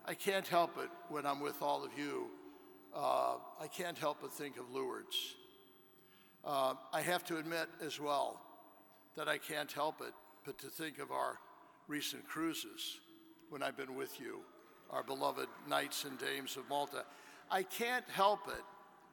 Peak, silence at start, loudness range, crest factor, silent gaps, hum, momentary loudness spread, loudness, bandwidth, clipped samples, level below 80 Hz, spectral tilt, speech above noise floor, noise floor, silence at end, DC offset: -18 dBFS; 0 s; 5 LU; 22 dB; none; none; 17 LU; -40 LUFS; 17.5 kHz; under 0.1%; -84 dBFS; -3 dB/octave; 25 dB; -65 dBFS; 0.05 s; under 0.1%